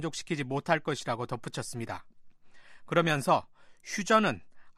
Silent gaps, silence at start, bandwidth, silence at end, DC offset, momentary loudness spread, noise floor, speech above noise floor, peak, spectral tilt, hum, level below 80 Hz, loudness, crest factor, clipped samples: none; 0 s; 13 kHz; 0.05 s; under 0.1%; 14 LU; -50 dBFS; 20 dB; -10 dBFS; -4.5 dB/octave; none; -66 dBFS; -30 LUFS; 22 dB; under 0.1%